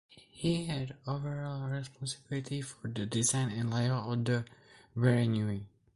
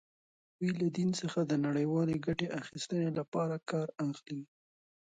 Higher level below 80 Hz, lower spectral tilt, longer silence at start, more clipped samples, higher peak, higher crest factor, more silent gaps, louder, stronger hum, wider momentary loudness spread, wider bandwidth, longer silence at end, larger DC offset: first, -62 dBFS vs -68 dBFS; second, -5 dB/octave vs -6.5 dB/octave; second, 0.15 s vs 0.6 s; neither; about the same, -14 dBFS vs -16 dBFS; about the same, 20 dB vs 20 dB; second, none vs 3.28-3.32 s; about the same, -34 LUFS vs -34 LUFS; neither; first, 10 LU vs 7 LU; first, 11.5 kHz vs 9.4 kHz; second, 0.3 s vs 0.6 s; neither